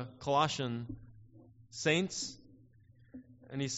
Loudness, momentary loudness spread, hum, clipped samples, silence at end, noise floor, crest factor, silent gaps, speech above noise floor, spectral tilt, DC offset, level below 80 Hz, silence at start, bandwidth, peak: -34 LUFS; 24 LU; none; under 0.1%; 0 s; -62 dBFS; 22 dB; none; 28 dB; -3.5 dB/octave; under 0.1%; -64 dBFS; 0 s; 8 kHz; -16 dBFS